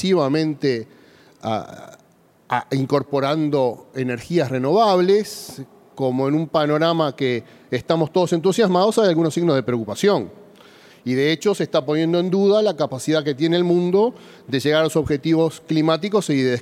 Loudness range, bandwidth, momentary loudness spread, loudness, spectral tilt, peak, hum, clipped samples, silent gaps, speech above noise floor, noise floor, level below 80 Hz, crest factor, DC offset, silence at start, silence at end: 4 LU; 15.5 kHz; 10 LU; -20 LUFS; -6 dB/octave; -4 dBFS; none; under 0.1%; none; 36 dB; -55 dBFS; -58 dBFS; 16 dB; under 0.1%; 0 s; 0 s